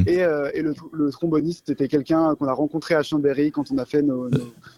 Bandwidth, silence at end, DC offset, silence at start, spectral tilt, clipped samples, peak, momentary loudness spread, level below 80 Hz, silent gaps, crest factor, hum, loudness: 12 kHz; 0.1 s; under 0.1%; 0 s; -7.5 dB/octave; under 0.1%; -8 dBFS; 6 LU; -56 dBFS; none; 14 dB; none; -22 LUFS